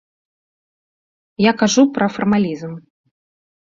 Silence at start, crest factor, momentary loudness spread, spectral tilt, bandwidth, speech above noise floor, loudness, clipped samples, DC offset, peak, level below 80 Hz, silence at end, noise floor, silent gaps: 1.4 s; 18 dB; 16 LU; -5 dB/octave; 7.6 kHz; over 74 dB; -16 LUFS; under 0.1%; under 0.1%; -2 dBFS; -58 dBFS; 0.9 s; under -90 dBFS; none